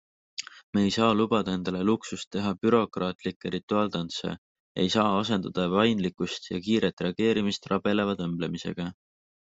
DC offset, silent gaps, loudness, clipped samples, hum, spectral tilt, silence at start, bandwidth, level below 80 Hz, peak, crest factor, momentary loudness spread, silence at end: under 0.1%; 0.63-0.73 s, 2.27-2.31 s, 3.15-3.19 s, 3.36-3.41 s, 3.63-3.68 s, 4.38-4.75 s, 6.93-6.97 s; -27 LUFS; under 0.1%; none; -5.5 dB/octave; 0.4 s; 8 kHz; -64 dBFS; -8 dBFS; 20 dB; 11 LU; 0.55 s